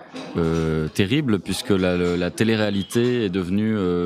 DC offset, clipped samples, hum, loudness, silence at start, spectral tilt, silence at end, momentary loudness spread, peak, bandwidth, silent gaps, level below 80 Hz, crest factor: under 0.1%; under 0.1%; none; -22 LUFS; 0 s; -6 dB/octave; 0 s; 3 LU; -4 dBFS; 15.5 kHz; none; -44 dBFS; 16 dB